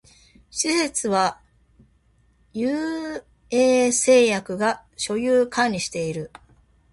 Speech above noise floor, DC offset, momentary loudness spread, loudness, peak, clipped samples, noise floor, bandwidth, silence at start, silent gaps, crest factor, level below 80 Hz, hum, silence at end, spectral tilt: 39 dB; under 0.1%; 16 LU; -21 LUFS; -6 dBFS; under 0.1%; -61 dBFS; 11.5 kHz; 0.55 s; none; 18 dB; -58 dBFS; none; 0.65 s; -3 dB/octave